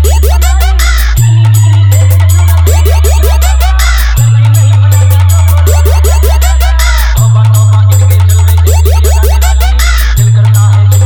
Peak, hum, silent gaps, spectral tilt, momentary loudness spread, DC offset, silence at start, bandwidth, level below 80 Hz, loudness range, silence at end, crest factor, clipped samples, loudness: 0 dBFS; none; none; -4.5 dB/octave; 3 LU; under 0.1%; 0 s; over 20 kHz; -8 dBFS; 0 LU; 0 s; 4 dB; 0.7%; -6 LUFS